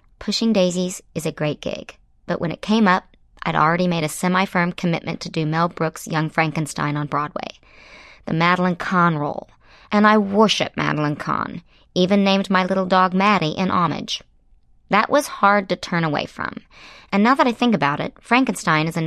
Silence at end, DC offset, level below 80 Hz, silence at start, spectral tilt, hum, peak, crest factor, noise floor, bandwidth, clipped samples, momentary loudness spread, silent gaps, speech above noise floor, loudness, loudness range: 0 s; under 0.1%; -54 dBFS; 0.2 s; -5.5 dB/octave; none; -2 dBFS; 18 dB; -54 dBFS; 14 kHz; under 0.1%; 11 LU; none; 34 dB; -20 LUFS; 4 LU